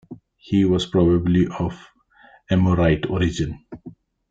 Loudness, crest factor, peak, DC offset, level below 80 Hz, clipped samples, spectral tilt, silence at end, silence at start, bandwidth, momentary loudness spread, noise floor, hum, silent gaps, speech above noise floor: -20 LUFS; 16 dB; -6 dBFS; under 0.1%; -42 dBFS; under 0.1%; -7.5 dB/octave; 0.4 s; 0.1 s; 7.8 kHz; 11 LU; -52 dBFS; none; none; 34 dB